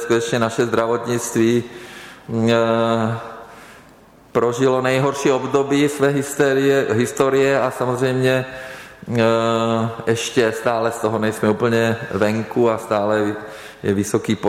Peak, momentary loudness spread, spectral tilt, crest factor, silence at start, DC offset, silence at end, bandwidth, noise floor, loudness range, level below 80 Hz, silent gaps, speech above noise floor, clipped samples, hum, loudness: -4 dBFS; 10 LU; -5.5 dB/octave; 14 dB; 0 s; under 0.1%; 0 s; 16 kHz; -47 dBFS; 3 LU; -56 dBFS; none; 29 dB; under 0.1%; none; -19 LUFS